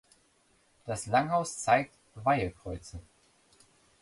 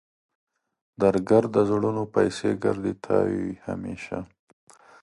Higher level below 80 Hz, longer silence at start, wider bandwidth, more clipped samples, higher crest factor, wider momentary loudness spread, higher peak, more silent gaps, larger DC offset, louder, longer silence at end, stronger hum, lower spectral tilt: about the same, -56 dBFS vs -56 dBFS; second, 0.85 s vs 1 s; about the same, 11.5 kHz vs 11.5 kHz; neither; about the same, 22 dB vs 20 dB; first, 18 LU vs 13 LU; second, -10 dBFS vs -6 dBFS; neither; neither; second, -30 LUFS vs -25 LUFS; first, 1 s vs 0.75 s; neither; second, -4.5 dB/octave vs -7 dB/octave